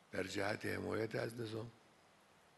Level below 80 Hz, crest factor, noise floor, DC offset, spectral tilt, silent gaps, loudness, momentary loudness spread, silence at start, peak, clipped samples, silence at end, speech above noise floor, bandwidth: -80 dBFS; 20 dB; -68 dBFS; under 0.1%; -5 dB/octave; none; -42 LUFS; 7 LU; 0.1 s; -24 dBFS; under 0.1%; 0.8 s; 26 dB; 12 kHz